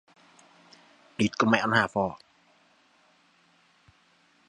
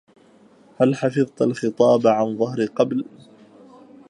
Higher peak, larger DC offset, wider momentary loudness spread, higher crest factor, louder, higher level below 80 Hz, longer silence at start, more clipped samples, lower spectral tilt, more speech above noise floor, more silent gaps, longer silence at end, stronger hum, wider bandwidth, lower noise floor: second, -6 dBFS vs -2 dBFS; neither; first, 18 LU vs 7 LU; first, 26 dB vs 20 dB; second, -25 LUFS vs -20 LUFS; first, -64 dBFS vs -70 dBFS; first, 1.2 s vs 0.8 s; neither; second, -5 dB/octave vs -7 dB/octave; first, 39 dB vs 33 dB; neither; first, 2.35 s vs 1.05 s; neither; about the same, 10.5 kHz vs 11 kHz; first, -64 dBFS vs -52 dBFS